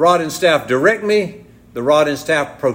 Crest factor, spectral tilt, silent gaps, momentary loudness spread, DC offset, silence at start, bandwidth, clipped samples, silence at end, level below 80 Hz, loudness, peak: 14 dB; -4.5 dB/octave; none; 8 LU; under 0.1%; 0 s; 16.5 kHz; under 0.1%; 0 s; -54 dBFS; -15 LUFS; -2 dBFS